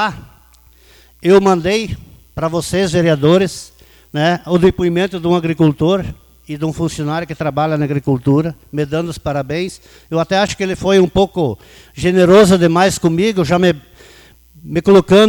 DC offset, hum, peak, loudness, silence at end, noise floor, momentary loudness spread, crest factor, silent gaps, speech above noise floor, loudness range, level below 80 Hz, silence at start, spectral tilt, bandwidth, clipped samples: under 0.1%; none; 0 dBFS; -14 LUFS; 0 s; -47 dBFS; 12 LU; 14 dB; none; 33 dB; 5 LU; -40 dBFS; 0 s; -6 dB/octave; over 20 kHz; under 0.1%